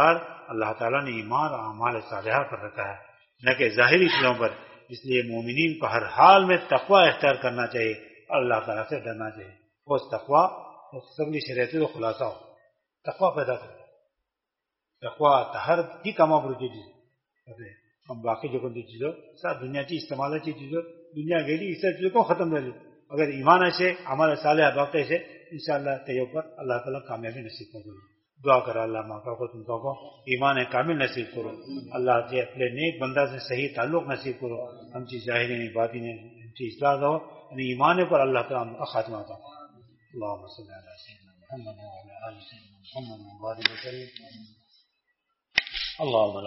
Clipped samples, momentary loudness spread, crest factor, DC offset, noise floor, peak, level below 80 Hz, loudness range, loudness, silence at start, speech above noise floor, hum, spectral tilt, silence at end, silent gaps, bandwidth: under 0.1%; 20 LU; 26 dB; under 0.1%; -86 dBFS; -2 dBFS; -68 dBFS; 14 LU; -25 LUFS; 0 s; 60 dB; none; -3 dB/octave; 0 s; none; 6 kHz